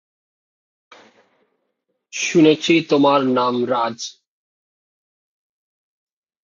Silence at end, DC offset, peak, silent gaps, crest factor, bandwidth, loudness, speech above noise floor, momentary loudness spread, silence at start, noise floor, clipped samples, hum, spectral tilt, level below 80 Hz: 2.3 s; under 0.1%; -2 dBFS; none; 18 dB; 7.6 kHz; -17 LUFS; 57 dB; 15 LU; 2.15 s; -74 dBFS; under 0.1%; none; -4.5 dB/octave; -70 dBFS